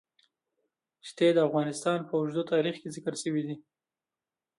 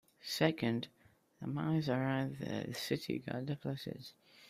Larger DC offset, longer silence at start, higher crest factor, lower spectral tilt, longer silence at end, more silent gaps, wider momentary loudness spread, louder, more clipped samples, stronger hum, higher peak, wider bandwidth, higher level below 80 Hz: neither; first, 1.05 s vs 0.25 s; second, 18 dB vs 24 dB; about the same, -5.5 dB/octave vs -6 dB/octave; first, 1 s vs 0 s; neither; about the same, 15 LU vs 13 LU; first, -29 LUFS vs -38 LUFS; neither; neither; about the same, -14 dBFS vs -14 dBFS; second, 11.5 kHz vs 15.5 kHz; second, -80 dBFS vs -72 dBFS